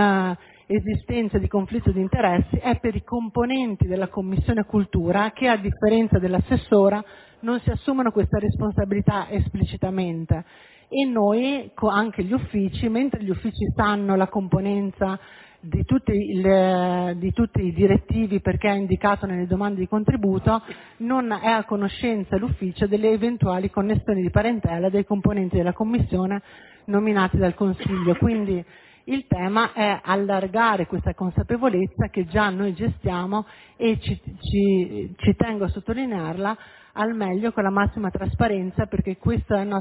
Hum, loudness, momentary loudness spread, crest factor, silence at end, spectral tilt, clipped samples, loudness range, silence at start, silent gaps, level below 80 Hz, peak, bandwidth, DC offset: none; -23 LUFS; 7 LU; 20 dB; 0 s; -11.5 dB/octave; under 0.1%; 3 LU; 0 s; none; -36 dBFS; -2 dBFS; 4 kHz; under 0.1%